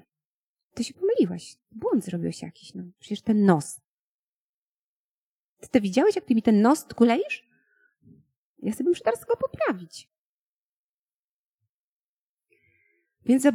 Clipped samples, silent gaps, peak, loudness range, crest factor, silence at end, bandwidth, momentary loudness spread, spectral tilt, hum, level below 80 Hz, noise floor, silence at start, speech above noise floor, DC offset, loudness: under 0.1%; 3.87-5.57 s, 8.36-8.55 s, 10.18-11.59 s, 11.69-12.37 s; -6 dBFS; 7 LU; 22 dB; 0 s; 15 kHz; 20 LU; -6 dB/octave; none; -66 dBFS; under -90 dBFS; 0.75 s; over 66 dB; under 0.1%; -25 LUFS